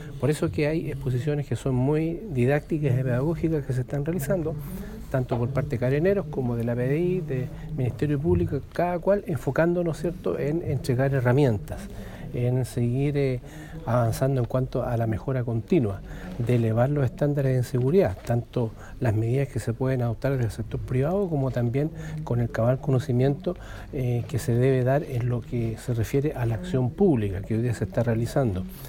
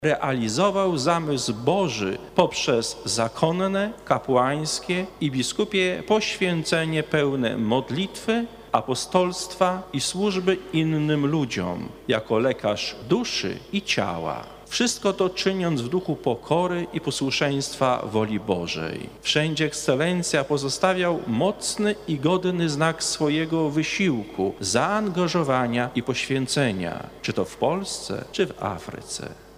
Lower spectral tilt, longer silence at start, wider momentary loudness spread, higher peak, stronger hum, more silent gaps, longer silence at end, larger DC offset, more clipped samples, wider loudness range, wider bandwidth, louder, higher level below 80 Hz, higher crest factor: first, -8 dB/octave vs -4.5 dB/octave; about the same, 0 s vs 0 s; about the same, 8 LU vs 6 LU; about the same, -8 dBFS vs -6 dBFS; neither; neither; about the same, 0 s vs 0 s; neither; neither; about the same, 2 LU vs 2 LU; about the same, 16.5 kHz vs 15.5 kHz; about the same, -26 LUFS vs -24 LUFS; first, -42 dBFS vs -54 dBFS; about the same, 16 dB vs 18 dB